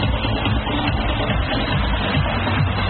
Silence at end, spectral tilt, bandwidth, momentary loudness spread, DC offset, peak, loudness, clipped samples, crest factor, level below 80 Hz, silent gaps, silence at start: 0 s; -4 dB/octave; 4.5 kHz; 1 LU; under 0.1%; -6 dBFS; -20 LUFS; under 0.1%; 12 dB; -26 dBFS; none; 0 s